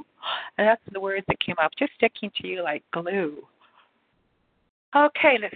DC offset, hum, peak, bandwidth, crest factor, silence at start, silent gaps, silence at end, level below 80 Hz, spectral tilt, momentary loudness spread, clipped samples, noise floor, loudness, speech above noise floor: under 0.1%; none; -6 dBFS; 4.6 kHz; 20 dB; 0.2 s; 4.69-4.92 s; 0 s; -60 dBFS; -8.5 dB/octave; 11 LU; under 0.1%; -69 dBFS; -24 LUFS; 45 dB